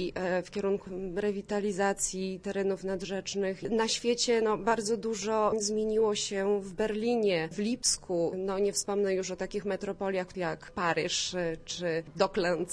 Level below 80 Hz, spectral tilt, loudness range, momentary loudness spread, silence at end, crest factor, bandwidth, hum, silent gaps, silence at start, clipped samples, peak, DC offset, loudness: -56 dBFS; -3.5 dB/octave; 3 LU; 6 LU; 0 s; 18 dB; 11 kHz; none; none; 0 s; under 0.1%; -12 dBFS; under 0.1%; -31 LUFS